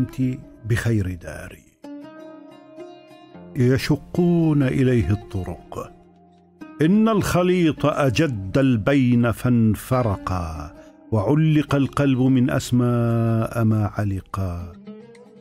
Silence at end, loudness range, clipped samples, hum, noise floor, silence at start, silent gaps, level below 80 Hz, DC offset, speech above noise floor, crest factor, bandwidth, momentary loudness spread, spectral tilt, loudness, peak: 0.35 s; 7 LU; under 0.1%; none; -52 dBFS; 0 s; none; -44 dBFS; under 0.1%; 33 dB; 14 dB; 16 kHz; 21 LU; -7.5 dB/octave; -20 LUFS; -6 dBFS